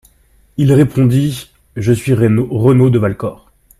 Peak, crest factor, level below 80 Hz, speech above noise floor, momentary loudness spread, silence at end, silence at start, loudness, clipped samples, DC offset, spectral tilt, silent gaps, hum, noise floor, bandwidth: 0 dBFS; 12 dB; -42 dBFS; 39 dB; 14 LU; 0.45 s; 0.6 s; -13 LUFS; under 0.1%; under 0.1%; -8 dB/octave; none; none; -51 dBFS; 14 kHz